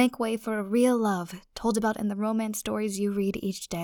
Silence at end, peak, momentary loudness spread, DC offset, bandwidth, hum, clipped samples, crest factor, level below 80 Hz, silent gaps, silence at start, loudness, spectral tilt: 0 s; -10 dBFS; 8 LU; under 0.1%; 19.5 kHz; none; under 0.1%; 18 dB; -56 dBFS; none; 0 s; -28 LUFS; -5 dB/octave